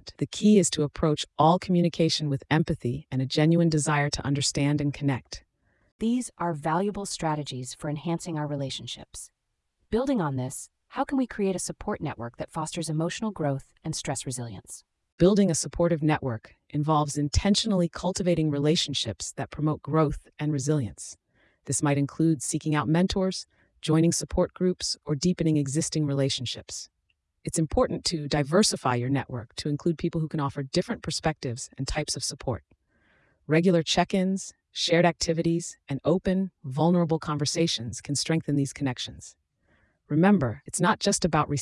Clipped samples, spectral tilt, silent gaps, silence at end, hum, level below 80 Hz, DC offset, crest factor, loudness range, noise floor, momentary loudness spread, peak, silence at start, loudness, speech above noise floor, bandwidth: under 0.1%; -5 dB/octave; 5.92-5.99 s, 15.12-15.18 s; 0 s; none; -48 dBFS; under 0.1%; 18 dB; 6 LU; -75 dBFS; 12 LU; -8 dBFS; 0.05 s; -26 LUFS; 49 dB; 12 kHz